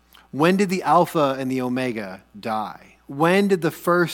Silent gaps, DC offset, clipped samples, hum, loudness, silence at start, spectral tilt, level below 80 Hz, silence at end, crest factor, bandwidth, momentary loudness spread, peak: none; under 0.1%; under 0.1%; none; -21 LUFS; 0.35 s; -6 dB/octave; -62 dBFS; 0 s; 18 dB; 18.5 kHz; 16 LU; -4 dBFS